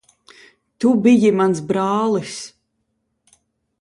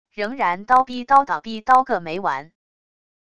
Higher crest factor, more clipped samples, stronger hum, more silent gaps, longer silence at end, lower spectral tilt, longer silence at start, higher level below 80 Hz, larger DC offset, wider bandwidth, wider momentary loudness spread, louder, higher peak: about the same, 16 dB vs 18 dB; neither; neither; neither; first, 1.35 s vs 0.8 s; about the same, -6 dB/octave vs -5 dB/octave; first, 0.8 s vs 0.15 s; second, -64 dBFS vs -58 dBFS; second, under 0.1% vs 0.6%; about the same, 11.5 kHz vs 11 kHz; first, 17 LU vs 9 LU; about the same, -17 LUFS vs -19 LUFS; about the same, -2 dBFS vs -2 dBFS